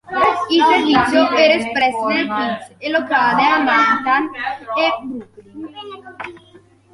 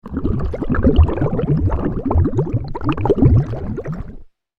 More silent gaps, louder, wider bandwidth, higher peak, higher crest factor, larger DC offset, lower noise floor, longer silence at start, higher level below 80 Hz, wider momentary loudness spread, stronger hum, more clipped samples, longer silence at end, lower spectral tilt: neither; first, -15 LUFS vs -18 LUFS; first, 11.5 kHz vs 5 kHz; about the same, -2 dBFS vs -2 dBFS; about the same, 16 dB vs 16 dB; neither; first, -48 dBFS vs -36 dBFS; about the same, 0.1 s vs 0.05 s; second, -54 dBFS vs -24 dBFS; first, 19 LU vs 12 LU; neither; neither; first, 0.55 s vs 0.35 s; second, -4 dB/octave vs -10.5 dB/octave